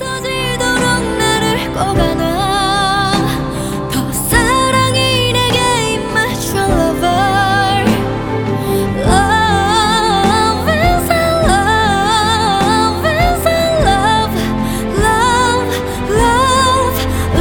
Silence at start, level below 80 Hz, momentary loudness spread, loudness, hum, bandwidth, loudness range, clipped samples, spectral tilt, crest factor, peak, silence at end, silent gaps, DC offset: 0 s; -26 dBFS; 6 LU; -13 LUFS; none; over 20 kHz; 2 LU; under 0.1%; -4 dB/octave; 12 dB; 0 dBFS; 0 s; none; under 0.1%